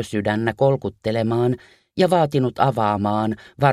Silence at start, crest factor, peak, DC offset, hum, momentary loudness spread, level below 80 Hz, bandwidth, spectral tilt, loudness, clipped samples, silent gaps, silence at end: 0 s; 18 dB; -2 dBFS; under 0.1%; none; 6 LU; -54 dBFS; 13.5 kHz; -7.5 dB/octave; -21 LUFS; under 0.1%; none; 0 s